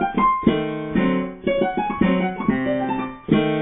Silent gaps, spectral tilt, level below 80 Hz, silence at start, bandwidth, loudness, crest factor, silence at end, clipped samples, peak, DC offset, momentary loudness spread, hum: none; -11 dB/octave; -44 dBFS; 0 s; 3.9 kHz; -21 LUFS; 18 dB; 0 s; under 0.1%; -2 dBFS; under 0.1%; 5 LU; none